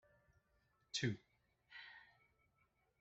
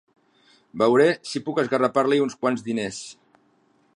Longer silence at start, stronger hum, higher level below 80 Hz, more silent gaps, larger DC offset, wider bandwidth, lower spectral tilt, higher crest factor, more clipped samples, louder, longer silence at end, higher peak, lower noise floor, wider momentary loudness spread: first, 0.95 s vs 0.75 s; neither; second, -80 dBFS vs -68 dBFS; neither; neither; second, 7.6 kHz vs 11 kHz; about the same, -4 dB/octave vs -5 dB/octave; first, 26 dB vs 18 dB; neither; second, -46 LUFS vs -22 LUFS; about the same, 0.95 s vs 0.85 s; second, -26 dBFS vs -6 dBFS; first, -81 dBFS vs -63 dBFS; first, 18 LU vs 15 LU